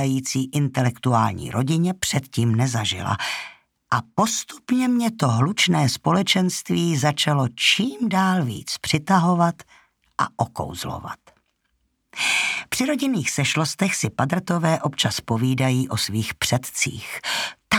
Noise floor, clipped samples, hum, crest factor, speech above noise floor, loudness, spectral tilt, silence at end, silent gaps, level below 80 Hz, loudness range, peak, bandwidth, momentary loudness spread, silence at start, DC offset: -70 dBFS; under 0.1%; none; 18 dB; 49 dB; -22 LUFS; -4.5 dB/octave; 0 s; none; -54 dBFS; 5 LU; -4 dBFS; 18.5 kHz; 8 LU; 0 s; under 0.1%